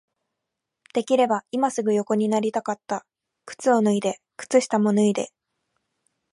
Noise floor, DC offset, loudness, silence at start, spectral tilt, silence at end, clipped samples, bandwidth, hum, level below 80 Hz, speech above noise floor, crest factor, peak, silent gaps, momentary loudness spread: -83 dBFS; under 0.1%; -23 LUFS; 0.95 s; -5.5 dB/octave; 1.05 s; under 0.1%; 11.5 kHz; none; -74 dBFS; 61 dB; 18 dB; -6 dBFS; none; 11 LU